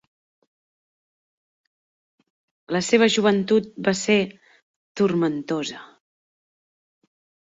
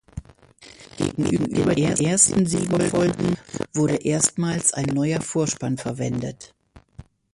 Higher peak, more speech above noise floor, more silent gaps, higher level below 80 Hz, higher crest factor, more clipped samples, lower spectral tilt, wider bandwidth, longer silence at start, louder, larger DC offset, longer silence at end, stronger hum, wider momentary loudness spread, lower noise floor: second, -6 dBFS vs -2 dBFS; first, over 69 dB vs 27 dB; first, 4.62-4.95 s vs none; second, -66 dBFS vs -48 dBFS; about the same, 20 dB vs 22 dB; neither; about the same, -4.5 dB/octave vs -4.5 dB/octave; second, 8 kHz vs 11.5 kHz; first, 2.7 s vs 0.15 s; about the same, -22 LUFS vs -22 LUFS; neither; first, 1.7 s vs 0.3 s; neither; about the same, 14 LU vs 12 LU; first, under -90 dBFS vs -49 dBFS